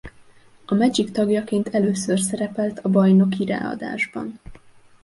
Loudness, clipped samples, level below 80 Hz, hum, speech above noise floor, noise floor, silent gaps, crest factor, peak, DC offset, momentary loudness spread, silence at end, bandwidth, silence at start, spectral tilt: -21 LUFS; under 0.1%; -54 dBFS; none; 29 dB; -50 dBFS; none; 16 dB; -6 dBFS; under 0.1%; 10 LU; 0.45 s; 11.5 kHz; 0.05 s; -6 dB/octave